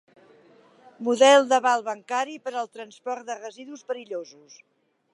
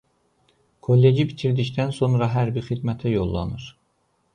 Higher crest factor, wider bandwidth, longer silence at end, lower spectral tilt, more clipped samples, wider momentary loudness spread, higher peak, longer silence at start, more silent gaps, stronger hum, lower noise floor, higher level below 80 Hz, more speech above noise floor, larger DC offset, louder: first, 22 dB vs 16 dB; first, 11.5 kHz vs 9.6 kHz; first, 0.9 s vs 0.65 s; second, -1.5 dB/octave vs -8.5 dB/octave; neither; first, 20 LU vs 14 LU; about the same, -4 dBFS vs -6 dBFS; about the same, 1 s vs 0.9 s; neither; neither; second, -55 dBFS vs -68 dBFS; second, -88 dBFS vs -44 dBFS; second, 31 dB vs 47 dB; neither; about the same, -23 LUFS vs -22 LUFS